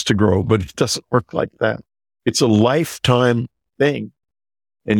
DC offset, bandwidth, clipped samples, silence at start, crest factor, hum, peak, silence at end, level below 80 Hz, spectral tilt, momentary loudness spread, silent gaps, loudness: under 0.1%; 18.5 kHz; under 0.1%; 0 s; 16 dB; none; -2 dBFS; 0 s; -48 dBFS; -5.5 dB/octave; 13 LU; none; -18 LUFS